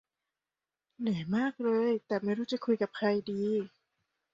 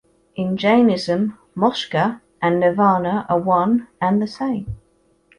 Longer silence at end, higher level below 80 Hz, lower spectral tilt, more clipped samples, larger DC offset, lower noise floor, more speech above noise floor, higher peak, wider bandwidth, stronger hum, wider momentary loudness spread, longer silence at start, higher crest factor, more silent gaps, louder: about the same, 0.65 s vs 0.65 s; second, -74 dBFS vs -50 dBFS; about the same, -7.5 dB/octave vs -7 dB/octave; neither; neither; first, under -90 dBFS vs -60 dBFS; first, over 59 dB vs 42 dB; second, -16 dBFS vs -4 dBFS; second, 7.6 kHz vs 11 kHz; neither; second, 5 LU vs 10 LU; first, 1 s vs 0.35 s; about the same, 16 dB vs 16 dB; neither; second, -32 LUFS vs -19 LUFS